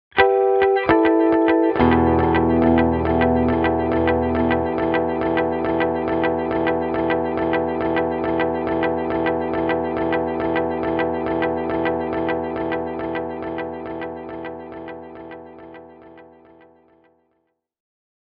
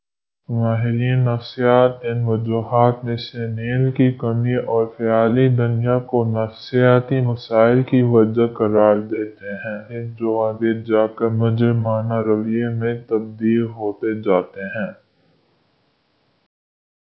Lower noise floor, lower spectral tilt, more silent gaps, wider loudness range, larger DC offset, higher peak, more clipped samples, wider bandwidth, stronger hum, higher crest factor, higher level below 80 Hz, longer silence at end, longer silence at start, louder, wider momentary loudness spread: first, -71 dBFS vs -64 dBFS; second, -5.5 dB/octave vs -10.5 dB/octave; neither; first, 15 LU vs 6 LU; neither; about the same, 0 dBFS vs 0 dBFS; neither; second, 5 kHz vs 5.8 kHz; neither; about the same, 20 dB vs 18 dB; first, -40 dBFS vs -56 dBFS; second, 2 s vs 2.15 s; second, 0.15 s vs 0.5 s; about the same, -20 LUFS vs -19 LUFS; first, 14 LU vs 11 LU